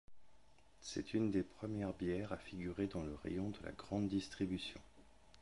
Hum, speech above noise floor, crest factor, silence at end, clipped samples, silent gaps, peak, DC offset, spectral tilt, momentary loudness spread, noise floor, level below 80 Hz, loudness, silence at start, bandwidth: none; 27 dB; 18 dB; 0.05 s; under 0.1%; none; -26 dBFS; under 0.1%; -6 dB/octave; 8 LU; -69 dBFS; -62 dBFS; -43 LUFS; 0.05 s; 11.5 kHz